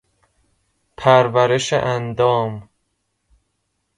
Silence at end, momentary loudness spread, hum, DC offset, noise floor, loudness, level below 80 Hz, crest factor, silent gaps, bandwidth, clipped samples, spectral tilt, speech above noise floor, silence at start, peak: 1.35 s; 10 LU; none; under 0.1%; -71 dBFS; -17 LUFS; -54 dBFS; 20 dB; none; 11.5 kHz; under 0.1%; -5 dB/octave; 55 dB; 1 s; 0 dBFS